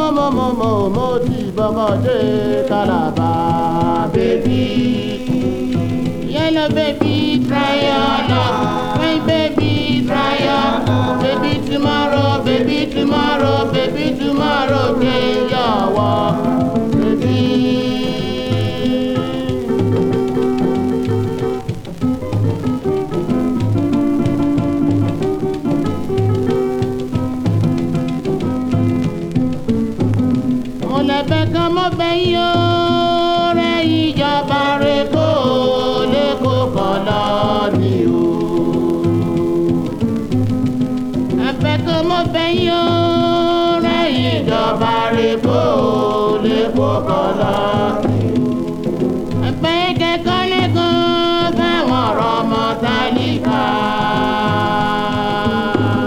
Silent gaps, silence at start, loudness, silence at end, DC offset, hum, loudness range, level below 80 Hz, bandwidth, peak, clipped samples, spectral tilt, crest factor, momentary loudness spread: none; 0 s; -16 LUFS; 0 s; under 0.1%; none; 3 LU; -38 dBFS; 15 kHz; 0 dBFS; under 0.1%; -7 dB/octave; 14 dB; 4 LU